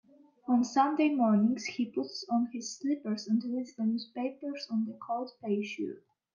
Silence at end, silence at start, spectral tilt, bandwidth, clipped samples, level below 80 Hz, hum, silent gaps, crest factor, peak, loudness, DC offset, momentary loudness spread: 0.35 s; 0.45 s; -5.5 dB/octave; 7.4 kHz; under 0.1%; -82 dBFS; none; none; 18 dB; -14 dBFS; -32 LUFS; under 0.1%; 11 LU